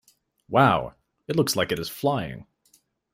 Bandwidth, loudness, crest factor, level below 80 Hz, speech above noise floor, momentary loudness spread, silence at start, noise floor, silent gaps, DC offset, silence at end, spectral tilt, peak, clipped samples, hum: 16 kHz; -24 LUFS; 22 dB; -56 dBFS; 41 dB; 17 LU; 0.5 s; -64 dBFS; none; under 0.1%; 0.7 s; -5 dB/octave; -4 dBFS; under 0.1%; none